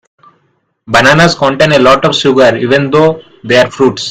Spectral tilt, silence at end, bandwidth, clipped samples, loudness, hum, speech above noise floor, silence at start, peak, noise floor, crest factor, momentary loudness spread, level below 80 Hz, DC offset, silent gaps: -5 dB/octave; 0 s; 16.5 kHz; 2%; -8 LUFS; none; 50 dB; 0.9 s; 0 dBFS; -58 dBFS; 8 dB; 6 LU; -40 dBFS; under 0.1%; none